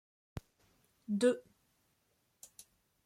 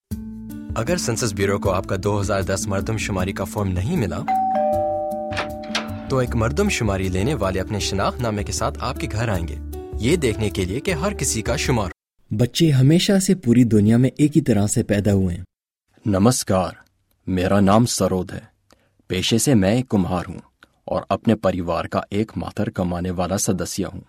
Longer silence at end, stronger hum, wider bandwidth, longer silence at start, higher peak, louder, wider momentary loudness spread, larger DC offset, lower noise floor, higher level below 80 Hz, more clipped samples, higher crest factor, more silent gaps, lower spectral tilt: first, 1.65 s vs 0.05 s; neither; second, 14.5 kHz vs 16.5 kHz; first, 0.35 s vs 0.1 s; second, -18 dBFS vs -2 dBFS; second, -34 LUFS vs -21 LUFS; first, 25 LU vs 11 LU; neither; first, -78 dBFS vs -62 dBFS; second, -68 dBFS vs -38 dBFS; neither; about the same, 22 dB vs 20 dB; neither; about the same, -5.5 dB/octave vs -5.5 dB/octave